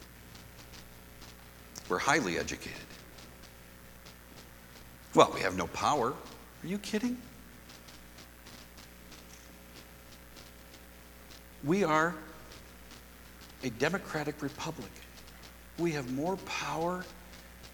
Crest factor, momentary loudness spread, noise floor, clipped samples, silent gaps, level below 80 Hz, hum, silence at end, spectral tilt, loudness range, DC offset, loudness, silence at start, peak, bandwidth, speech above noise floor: 30 dB; 23 LU; -53 dBFS; under 0.1%; none; -58 dBFS; 60 Hz at -55 dBFS; 0 s; -4.5 dB/octave; 17 LU; under 0.1%; -32 LUFS; 0 s; -6 dBFS; 19 kHz; 21 dB